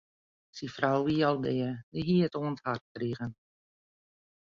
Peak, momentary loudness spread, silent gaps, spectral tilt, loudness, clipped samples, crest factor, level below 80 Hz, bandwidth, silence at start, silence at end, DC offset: -12 dBFS; 14 LU; 1.83-1.92 s, 2.81-2.95 s; -7.5 dB/octave; -31 LUFS; under 0.1%; 20 dB; -64 dBFS; 7.4 kHz; 0.55 s; 1.15 s; under 0.1%